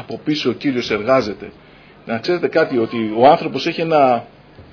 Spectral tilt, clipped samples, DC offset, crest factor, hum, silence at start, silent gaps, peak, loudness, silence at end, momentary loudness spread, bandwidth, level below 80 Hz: -6 dB/octave; under 0.1%; under 0.1%; 18 dB; none; 0 s; none; 0 dBFS; -17 LUFS; 0.1 s; 12 LU; 5.4 kHz; -54 dBFS